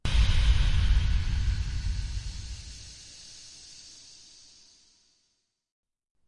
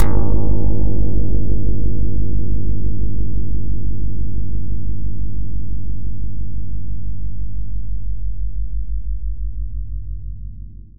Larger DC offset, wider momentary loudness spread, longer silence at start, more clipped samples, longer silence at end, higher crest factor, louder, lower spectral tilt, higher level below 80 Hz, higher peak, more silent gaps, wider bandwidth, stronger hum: second, under 0.1% vs 30%; first, 22 LU vs 9 LU; about the same, 0.05 s vs 0 s; neither; first, 2.4 s vs 0 s; first, 18 dB vs 12 dB; second, -29 LUFS vs -25 LUFS; second, -4.5 dB/octave vs -10.5 dB/octave; second, -30 dBFS vs -22 dBFS; second, -12 dBFS vs 0 dBFS; neither; first, 11 kHz vs 1.8 kHz; neither